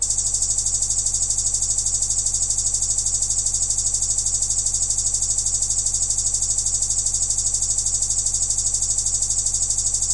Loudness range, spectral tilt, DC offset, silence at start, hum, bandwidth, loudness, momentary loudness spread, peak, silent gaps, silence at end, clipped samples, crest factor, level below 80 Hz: 0 LU; 0 dB/octave; under 0.1%; 0 s; none; 11.5 kHz; -18 LUFS; 0 LU; -8 dBFS; none; 0 s; under 0.1%; 14 dB; -36 dBFS